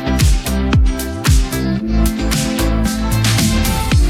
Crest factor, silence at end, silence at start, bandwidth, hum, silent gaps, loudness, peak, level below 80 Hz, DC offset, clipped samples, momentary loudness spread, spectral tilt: 12 dB; 0 s; 0 s; 17 kHz; none; none; -16 LUFS; -2 dBFS; -18 dBFS; under 0.1%; under 0.1%; 4 LU; -5 dB/octave